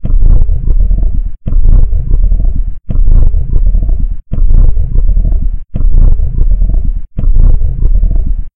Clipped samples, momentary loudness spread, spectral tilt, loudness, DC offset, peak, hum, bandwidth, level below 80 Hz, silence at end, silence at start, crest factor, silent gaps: 5%; 6 LU; -12.5 dB/octave; -14 LUFS; under 0.1%; 0 dBFS; none; 1.2 kHz; -6 dBFS; 0.05 s; 0 s; 6 dB; none